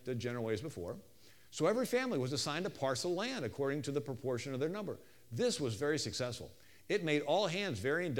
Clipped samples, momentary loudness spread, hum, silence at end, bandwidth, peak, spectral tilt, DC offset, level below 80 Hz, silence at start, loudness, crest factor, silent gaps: under 0.1%; 12 LU; none; 0 s; 19 kHz; -18 dBFS; -4.5 dB/octave; under 0.1%; -70 dBFS; 0.05 s; -37 LUFS; 18 dB; none